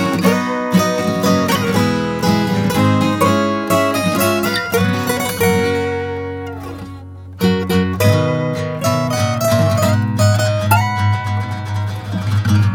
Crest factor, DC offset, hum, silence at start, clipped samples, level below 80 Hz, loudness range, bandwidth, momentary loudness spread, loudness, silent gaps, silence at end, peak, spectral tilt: 16 dB; under 0.1%; none; 0 s; under 0.1%; -46 dBFS; 3 LU; 19.5 kHz; 8 LU; -16 LUFS; none; 0 s; 0 dBFS; -5.5 dB/octave